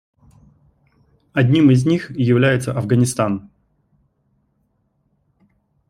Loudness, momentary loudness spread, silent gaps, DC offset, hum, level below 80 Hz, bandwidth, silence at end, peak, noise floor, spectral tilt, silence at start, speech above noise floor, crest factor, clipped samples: -17 LUFS; 9 LU; none; under 0.1%; none; -54 dBFS; 14 kHz; 2.45 s; -2 dBFS; -66 dBFS; -6.5 dB/octave; 1.35 s; 50 dB; 18 dB; under 0.1%